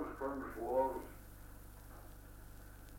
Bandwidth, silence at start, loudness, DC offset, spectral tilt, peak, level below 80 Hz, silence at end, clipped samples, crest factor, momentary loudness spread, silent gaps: 17 kHz; 0 s; -40 LUFS; under 0.1%; -6.5 dB/octave; -24 dBFS; -56 dBFS; 0 s; under 0.1%; 20 dB; 20 LU; none